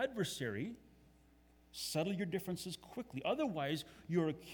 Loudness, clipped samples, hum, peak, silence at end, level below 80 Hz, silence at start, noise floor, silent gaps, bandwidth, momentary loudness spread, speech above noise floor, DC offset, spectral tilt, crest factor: -40 LUFS; under 0.1%; none; -22 dBFS; 0 s; -70 dBFS; 0 s; -67 dBFS; none; over 20 kHz; 10 LU; 27 dB; under 0.1%; -5 dB/octave; 18 dB